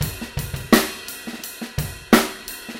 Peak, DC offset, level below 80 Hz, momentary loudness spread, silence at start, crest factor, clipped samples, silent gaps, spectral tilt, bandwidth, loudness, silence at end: 0 dBFS; under 0.1%; -40 dBFS; 14 LU; 0 s; 22 dB; under 0.1%; none; -4 dB/octave; 17 kHz; -22 LUFS; 0 s